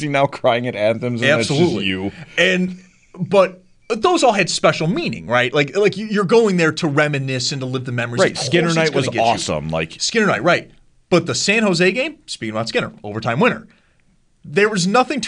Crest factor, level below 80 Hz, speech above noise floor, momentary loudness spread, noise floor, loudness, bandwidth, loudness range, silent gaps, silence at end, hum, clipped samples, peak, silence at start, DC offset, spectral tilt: 16 dB; -52 dBFS; 39 dB; 8 LU; -57 dBFS; -17 LUFS; 10.5 kHz; 2 LU; none; 0 s; none; under 0.1%; -2 dBFS; 0 s; under 0.1%; -4.5 dB/octave